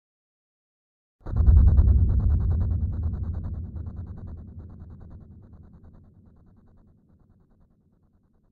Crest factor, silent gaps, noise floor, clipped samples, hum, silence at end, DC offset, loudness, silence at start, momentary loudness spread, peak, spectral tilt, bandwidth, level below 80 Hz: 20 dB; none; -63 dBFS; under 0.1%; none; 3.1 s; under 0.1%; -24 LUFS; 1.25 s; 26 LU; -6 dBFS; -12.5 dB/octave; 1.8 kHz; -28 dBFS